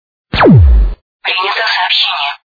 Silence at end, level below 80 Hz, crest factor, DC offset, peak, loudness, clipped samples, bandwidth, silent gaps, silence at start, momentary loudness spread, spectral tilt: 0.2 s; -16 dBFS; 10 dB; under 0.1%; 0 dBFS; -10 LUFS; 0.3%; 5 kHz; 1.02-1.20 s; 0.35 s; 13 LU; -7 dB/octave